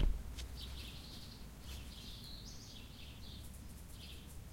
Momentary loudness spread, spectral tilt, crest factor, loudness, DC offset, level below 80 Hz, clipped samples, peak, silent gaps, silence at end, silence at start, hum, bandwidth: 5 LU; -4 dB/octave; 20 dB; -50 LUFS; under 0.1%; -46 dBFS; under 0.1%; -24 dBFS; none; 0 s; 0 s; none; 16.5 kHz